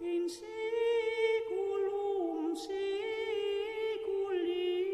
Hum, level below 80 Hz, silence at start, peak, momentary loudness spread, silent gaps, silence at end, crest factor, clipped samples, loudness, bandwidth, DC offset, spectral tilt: none; -72 dBFS; 0 s; -20 dBFS; 5 LU; none; 0 s; 14 dB; under 0.1%; -34 LUFS; 12.5 kHz; under 0.1%; -3.5 dB/octave